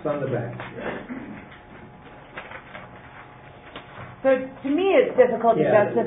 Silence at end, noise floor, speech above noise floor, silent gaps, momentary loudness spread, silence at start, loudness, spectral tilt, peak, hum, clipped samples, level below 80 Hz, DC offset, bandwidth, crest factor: 0 s; -45 dBFS; 23 dB; none; 25 LU; 0 s; -22 LUFS; -11 dB/octave; -4 dBFS; none; under 0.1%; -56 dBFS; under 0.1%; 3.9 kHz; 20 dB